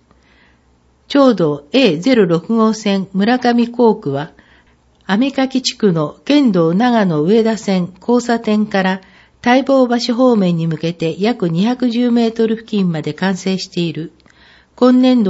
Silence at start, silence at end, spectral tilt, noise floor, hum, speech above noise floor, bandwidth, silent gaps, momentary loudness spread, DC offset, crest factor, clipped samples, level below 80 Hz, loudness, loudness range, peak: 1.1 s; 0 s; -6 dB/octave; -54 dBFS; none; 40 dB; 8 kHz; none; 7 LU; under 0.1%; 14 dB; under 0.1%; -56 dBFS; -15 LUFS; 2 LU; 0 dBFS